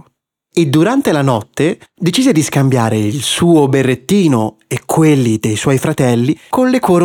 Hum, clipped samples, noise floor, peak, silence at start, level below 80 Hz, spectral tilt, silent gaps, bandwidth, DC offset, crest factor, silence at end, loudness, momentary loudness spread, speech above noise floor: none; under 0.1%; -59 dBFS; -2 dBFS; 0.55 s; -50 dBFS; -5.5 dB/octave; none; 18 kHz; under 0.1%; 10 dB; 0 s; -13 LUFS; 6 LU; 47 dB